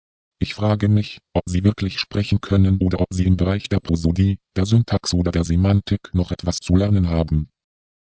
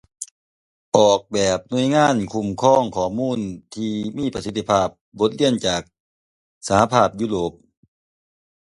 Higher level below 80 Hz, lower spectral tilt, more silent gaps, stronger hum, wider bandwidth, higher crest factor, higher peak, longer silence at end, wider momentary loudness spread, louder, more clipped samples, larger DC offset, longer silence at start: first, -30 dBFS vs -50 dBFS; first, -7 dB/octave vs -5 dB/octave; second, none vs 0.31-0.92 s, 5.01-5.12 s, 6.00-6.61 s; neither; second, 8 kHz vs 11.5 kHz; about the same, 16 dB vs 20 dB; about the same, -2 dBFS vs 0 dBFS; second, 0.65 s vs 1.2 s; second, 6 LU vs 11 LU; about the same, -20 LUFS vs -20 LUFS; neither; neither; first, 0.4 s vs 0.2 s